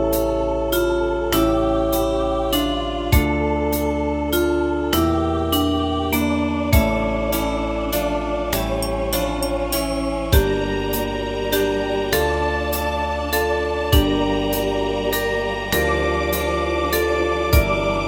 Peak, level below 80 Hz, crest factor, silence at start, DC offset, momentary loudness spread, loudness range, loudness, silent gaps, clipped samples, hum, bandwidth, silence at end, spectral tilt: -2 dBFS; -28 dBFS; 18 dB; 0 s; under 0.1%; 4 LU; 2 LU; -20 LUFS; none; under 0.1%; none; 17.5 kHz; 0 s; -5 dB/octave